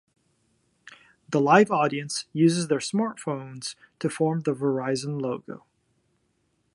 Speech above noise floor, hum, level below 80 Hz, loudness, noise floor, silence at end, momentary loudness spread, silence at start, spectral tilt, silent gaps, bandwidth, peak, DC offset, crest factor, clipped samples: 47 dB; none; -72 dBFS; -25 LUFS; -71 dBFS; 1.2 s; 17 LU; 0.85 s; -5.5 dB/octave; none; 11.5 kHz; -4 dBFS; under 0.1%; 22 dB; under 0.1%